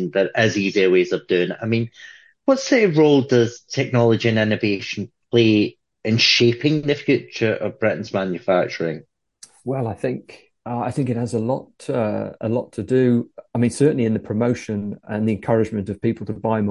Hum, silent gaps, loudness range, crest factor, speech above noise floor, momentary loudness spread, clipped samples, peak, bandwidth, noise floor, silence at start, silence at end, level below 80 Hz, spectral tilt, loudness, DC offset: none; none; 7 LU; 18 dB; 30 dB; 11 LU; under 0.1%; -2 dBFS; 11.5 kHz; -50 dBFS; 0 s; 0 s; -54 dBFS; -6 dB/octave; -20 LUFS; under 0.1%